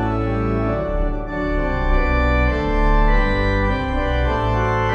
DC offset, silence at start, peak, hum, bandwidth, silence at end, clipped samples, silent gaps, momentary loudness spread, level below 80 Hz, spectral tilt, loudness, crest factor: under 0.1%; 0 s; -6 dBFS; none; 6.6 kHz; 0 s; under 0.1%; none; 5 LU; -20 dBFS; -8 dB/octave; -20 LUFS; 12 dB